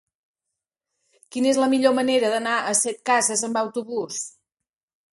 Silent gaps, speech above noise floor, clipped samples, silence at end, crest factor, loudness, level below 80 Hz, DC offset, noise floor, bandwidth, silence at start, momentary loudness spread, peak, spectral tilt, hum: none; 67 dB; under 0.1%; 0.85 s; 18 dB; -22 LUFS; -74 dBFS; under 0.1%; -88 dBFS; 12 kHz; 1.3 s; 11 LU; -6 dBFS; -2 dB/octave; none